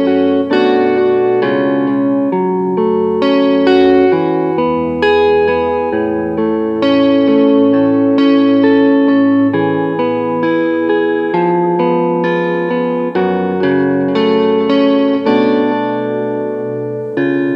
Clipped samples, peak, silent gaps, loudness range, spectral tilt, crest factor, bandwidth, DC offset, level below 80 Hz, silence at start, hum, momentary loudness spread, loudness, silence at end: under 0.1%; 0 dBFS; none; 3 LU; -8.5 dB/octave; 12 dB; 5.6 kHz; under 0.1%; -50 dBFS; 0 s; none; 6 LU; -13 LUFS; 0 s